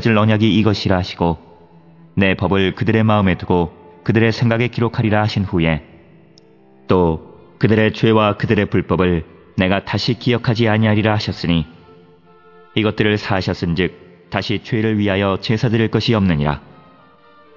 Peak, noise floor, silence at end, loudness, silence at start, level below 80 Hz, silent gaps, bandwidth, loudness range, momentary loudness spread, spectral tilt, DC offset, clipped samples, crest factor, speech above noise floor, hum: 0 dBFS; -48 dBFS; 1 s; -17 LUFS; 0 s; -44 dBFS; none; 6 kHz; 3 LU; 7 LU; -7.5 dB/octave; 0.2%; under 0.1%; 16 dB; 32 dB; none